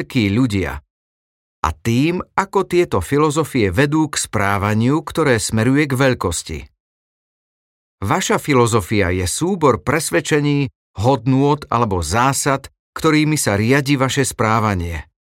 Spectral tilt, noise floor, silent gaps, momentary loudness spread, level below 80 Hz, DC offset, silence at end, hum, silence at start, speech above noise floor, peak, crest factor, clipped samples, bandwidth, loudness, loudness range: -5 dB/octave; under -90 dBFS; 0.90-1.63 s, 6.80-7.98 s, 10.75-10.94 s, 12.79-12.93 s; 7 LU; -42 dBFS; under 0.1%; 0.2 s; none; 0 s; over 73 dB; -2 dBFS; 16 dB; under 0.1%; 17 kHz; -17 LUFS; 3 LU